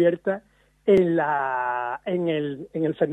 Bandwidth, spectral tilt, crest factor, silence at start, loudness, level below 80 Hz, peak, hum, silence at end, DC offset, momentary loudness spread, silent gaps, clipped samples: 8 kHz; -8.5 dB/octave; 16 dB; 0 s; -24 LUFS; -60 dBFS; -6 dBFS; none; 0 s; under 0.1%; 10 LU; none; under 0.1%